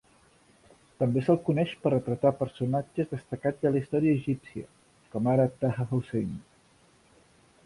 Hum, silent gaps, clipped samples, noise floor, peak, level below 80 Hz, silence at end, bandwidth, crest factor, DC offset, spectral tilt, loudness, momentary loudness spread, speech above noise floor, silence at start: none; none; under 0.1%; -62 dBFS; -10 dBFS; -60 dBFS; 1.25 s; 11.5 kHz; 18 dB; under 0.1%; -9 dB/octave; -28 LUFS; 10 LU; 34 dB; 1 s